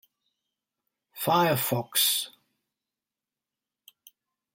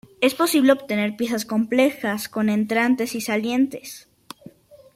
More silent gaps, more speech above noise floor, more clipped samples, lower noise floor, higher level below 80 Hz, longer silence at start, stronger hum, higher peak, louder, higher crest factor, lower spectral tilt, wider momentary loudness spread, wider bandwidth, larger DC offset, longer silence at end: neither; first, 65 dB vs 26 dB; neither; first, -90 dBFS vs -47 dBFS; second, -76 dBFS vs -66 dBFS; first, 1.15 s vs 0.2 s; neither; second, -10 dBFS vs -4 dBFS; second, -25 LUFS vs -21 LUFS; about the same, 22 dB vs 18 dB; second, -3 dB/octave vs -4.5 dB/octave; second, 9 LU vs 20 LU; about the same, 16.5 kHz vs 16 kHz; neither; first, 2.25 s vs 0.45 s